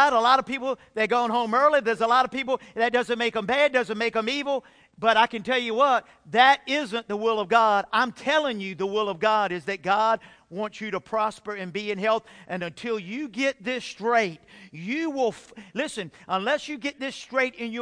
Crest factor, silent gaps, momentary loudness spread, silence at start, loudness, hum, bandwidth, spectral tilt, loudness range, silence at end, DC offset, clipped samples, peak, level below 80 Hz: 20 dB; none; 11 LU; 0 s; -24 LUFS; none; 10.5 kHz; -4 dB/octave; 6 LU; 0 s; under 0.1%; under 0.1%; -4 dBFS; -66 dBFS